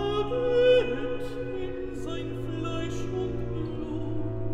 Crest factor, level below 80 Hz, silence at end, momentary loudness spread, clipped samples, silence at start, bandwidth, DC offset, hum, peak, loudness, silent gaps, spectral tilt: 16 dB; -42 dBFS; 0 s; 12 LU; under 0.1%; 0 s; 10 kHz; under 0.1%; none; -12 dBFS; -29 LUFS; none; -7 dB/octave